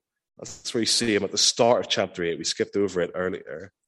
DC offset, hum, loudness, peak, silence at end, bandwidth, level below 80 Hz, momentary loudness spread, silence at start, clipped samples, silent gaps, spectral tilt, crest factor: under 0.1%; none; -23 LUFS; -6 dBFS; 0.2 s; 12.5 kHz; -64 dBFS; 16 LU; 0.4 s; under 0.1%; none; -2.5 dB/octave; 18 dB